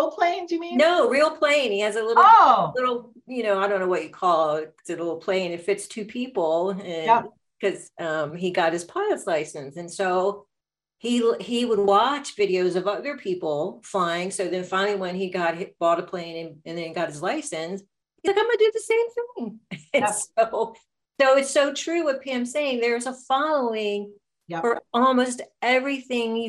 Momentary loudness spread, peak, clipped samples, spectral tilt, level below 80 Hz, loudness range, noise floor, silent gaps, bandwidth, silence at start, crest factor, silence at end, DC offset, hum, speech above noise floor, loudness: 13 LU; -4 dBFS; under 0.1%; -4 dB/octave; -74 dBFS; 7 LU; -86 dBFS; none; 13 kHz; 0 s; 20 dB; 0 s; under 0.1%; none; 63 dB; -23 LUFS